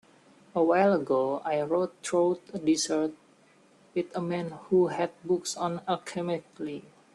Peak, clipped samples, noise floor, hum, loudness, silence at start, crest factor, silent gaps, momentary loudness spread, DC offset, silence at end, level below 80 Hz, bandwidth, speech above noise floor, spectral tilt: -12 dBFS; under 0.1%; -60 dBFS; none; -29 LUFS; 0.55 s; 18 dB; none; 10 LU; under 0.1%; 0.35 s; -72 dBFS; 12 kHz; 33 dB; -5 dB/octave